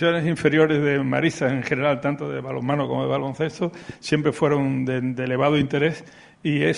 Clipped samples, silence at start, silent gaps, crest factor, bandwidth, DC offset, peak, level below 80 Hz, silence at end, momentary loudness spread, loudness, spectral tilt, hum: under 0.1%; 0 s; none; 18 dB; 11 kHz; under 0.1%; -4 dBFS; -58 dBFS; 0 s; 9 LU; -22 LUFS; -6.5 dB/octave; none